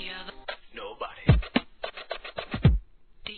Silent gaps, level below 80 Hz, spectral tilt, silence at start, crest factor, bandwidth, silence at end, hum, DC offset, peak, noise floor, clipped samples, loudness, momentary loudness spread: none; -34 dBFS; -10 dB/octave; 0 s; 22 dB; 4.5 kHz; 0 s; none; 0.2%; -8 dBFS; -45 dBFS; under 0.1%; -29 LUFS; 15 LU